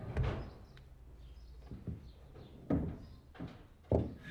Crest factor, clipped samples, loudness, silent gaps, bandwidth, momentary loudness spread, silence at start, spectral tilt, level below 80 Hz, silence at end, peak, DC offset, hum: 24 dB; under 0.1%; -40 LUFS; none; 9 kHz; 21 LU; 0 s; -9 dB/octave; -48 dBFS; 0 s; -16 dBFS; under 0.1%; none